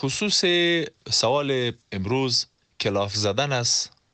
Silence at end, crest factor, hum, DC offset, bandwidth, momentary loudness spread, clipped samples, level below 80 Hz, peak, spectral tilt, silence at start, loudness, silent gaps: 0.25 s; 16 dB; none; under 0.1%; 9.2 kHz; 8 LU; under 0.1%; -60 dBFS; -8 dBFS; -3 dB/octave; 0 s; -23 LUFS; none